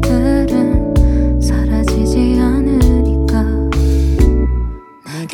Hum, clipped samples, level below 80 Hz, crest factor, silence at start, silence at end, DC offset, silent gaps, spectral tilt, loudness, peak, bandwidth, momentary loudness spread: none; under 0.1%; -16 dBFS; 12 dB; 0 s; 0 s; under 0.1%; none; -7.5 dB/octave; -14 LUFS; 0 dBFS; 12.5 kHz; 6 LU